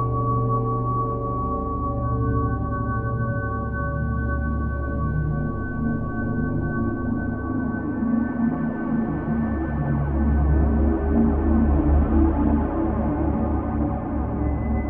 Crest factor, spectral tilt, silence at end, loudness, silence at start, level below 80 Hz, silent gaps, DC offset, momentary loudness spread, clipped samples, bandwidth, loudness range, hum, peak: 14 dB; -13 dB/octave; 0 s; -24 LUFS; 0 s; -28 dBFS; none; under 0.1%; 6 LU; under 0.1%; 2.8 kHz; 5 LU; none; -8 dBFS